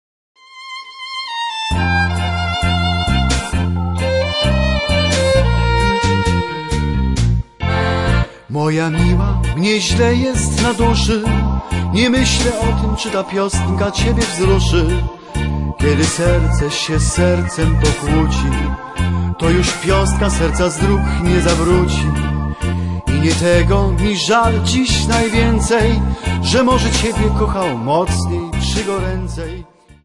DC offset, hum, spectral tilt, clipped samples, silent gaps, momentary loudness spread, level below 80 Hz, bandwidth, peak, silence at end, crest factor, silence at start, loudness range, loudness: 0.4%; none; -5 dB/octave; under 0.1%; none; 7 LU; -22 dBFS; 11.5 kHz; 0 dBFS; 0.1 s; 14 dB; 0.5 s; 3 LU; -16 LUFS